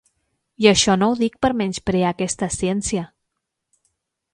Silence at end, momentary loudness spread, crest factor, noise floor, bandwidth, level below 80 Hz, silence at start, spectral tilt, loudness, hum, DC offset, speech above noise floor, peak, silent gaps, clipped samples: 1.25 s; 9 LU; 20 dB; -79 dBFS; 11 kHz; -46 dBFS; 0.6 s; -4 dB/octave; -19 LUFS; none; under 0.1%; 60 dB; 0 dBFS; none; under 0.1%